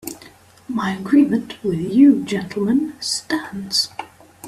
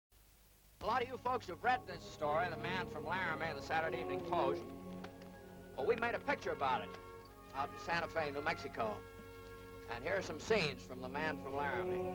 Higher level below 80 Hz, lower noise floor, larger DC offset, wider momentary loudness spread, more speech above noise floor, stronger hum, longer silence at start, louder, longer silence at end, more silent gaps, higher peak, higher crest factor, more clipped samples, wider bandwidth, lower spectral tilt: first, -58 dBFS vs -64 dBFS; second, -46 dBFS vs -66 dBFS; neither; second, 12 LU vs 16 LU; about the same, 28 dB vs 27 dB; neither; second, 0.05 s vs 0.2 s; first, -19 LUFS vs -39 LUFS; about the same, 0 s vs 0 s; neither; first, -2 dBFS vs -22 dBFS; about the same, 16 dB vs 18 dB; neither; second, 15 kHz vs 19 kHz; about the same, -4.5 dB/octave vs -5 dB/octave